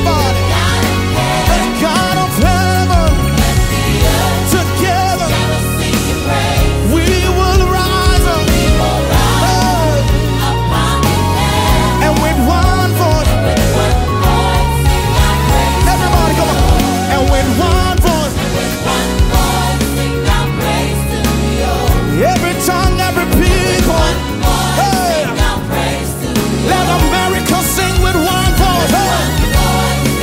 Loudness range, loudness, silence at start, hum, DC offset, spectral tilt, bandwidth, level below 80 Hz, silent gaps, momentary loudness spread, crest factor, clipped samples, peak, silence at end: 2 LU; -12 LUFS; 0 s; none; under 0.1%; -5 dB/octave; 16.5 kHz; -18 dBFS; none; 3 LU; 12 dB; under 0.1%; 0 dBFS; 0 s